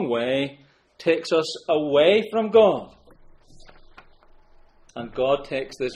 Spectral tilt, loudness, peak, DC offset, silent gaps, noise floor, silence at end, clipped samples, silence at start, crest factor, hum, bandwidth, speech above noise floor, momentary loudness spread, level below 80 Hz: -5 dB/octave; -22 LUFS; -4 dBFS; under 0.1%; none; -52 dBFS; 0 s; under 0.1%; 0 s; 18 dB; none; 10 kHz; 31 dB; 14 LU; -54 dBFS